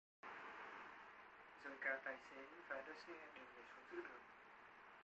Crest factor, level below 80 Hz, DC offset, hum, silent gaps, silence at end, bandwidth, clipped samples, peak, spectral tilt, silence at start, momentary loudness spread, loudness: 24 dB; -88 dBFS; under 0.1%; none; none; 0 s; 8.2 kHz; under 0.1%; -32 dBFS; -3.5 dB/octave; 0.25 s; 16 LU; -54 LUFS